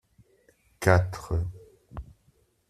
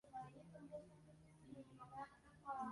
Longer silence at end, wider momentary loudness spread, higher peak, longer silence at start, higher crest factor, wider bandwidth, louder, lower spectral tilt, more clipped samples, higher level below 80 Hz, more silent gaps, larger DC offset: first, 0.7 s vs 0 s; first, 22 LU vs 13 LU; first, -4 dBFS vs -38 dBFS; first, 0.8 s vs 0.05 s; first, 26 dB vs 18 dB; first, 14 kHz vs 11 kHz; first, -27 LUFS vs -57 LUFS; about the same, -6.5 dB/octave vs -6.5 dB/octave; neither; first, -46 dBFS vs -78 dBFS; neither; neither